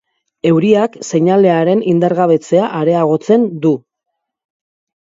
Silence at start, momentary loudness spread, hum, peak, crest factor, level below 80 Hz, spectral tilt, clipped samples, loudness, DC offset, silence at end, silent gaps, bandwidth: 0.45 s; 6 LU; none; 0 dBFS; 14 dB; -60 dBFS; -7 dB/octave; under 0.1%; -13 LUFS; under 0.1%; 1.25 s; none; 7.8 kHz